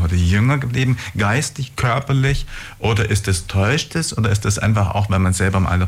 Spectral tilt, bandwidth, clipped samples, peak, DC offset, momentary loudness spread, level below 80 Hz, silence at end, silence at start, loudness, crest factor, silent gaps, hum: -5 dB/octave; 15.5 kHz; under 0.1%; -6 dBFS; under 0.1%; 4 LU; -34 dBFS; 0 s; 0 s; -18 LUFS; 10 dB; none; none